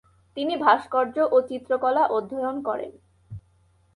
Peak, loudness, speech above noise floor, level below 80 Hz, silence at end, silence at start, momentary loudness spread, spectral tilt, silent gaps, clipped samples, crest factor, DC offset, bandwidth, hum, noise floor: -6 dBFS; -24 LUFS; 38 dB; -62 dBFS; 0.55 s; 0.35 s; 23 LU; -6.5 dB/octave; none; under 0.1%; 18 dB; under 0.1%; 11 kHz; none; -62 dBFS